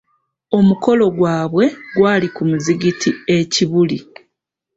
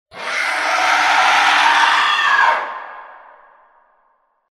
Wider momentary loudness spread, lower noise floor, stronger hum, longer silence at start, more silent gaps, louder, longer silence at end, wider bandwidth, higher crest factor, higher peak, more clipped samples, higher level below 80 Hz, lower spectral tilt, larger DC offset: second, 5 LU vs 12 LU; first, -76 dBFS vs -61 dBFS; neither; first, 0.5 s vs 0.15 s; neither; about the same, -16 LUFS vs -14 LUFS; second, 0.75 s vs 1.4 s; second, 8 kHz vs 15 kHz; about the same, 14 dB vs 16 dB; about the same, -2 dBFS vs 0 dBFS; neither; first, -54 dBFS vs -66 dBFS; first, -5.5 dB/octave vs 1 dB/octave; neither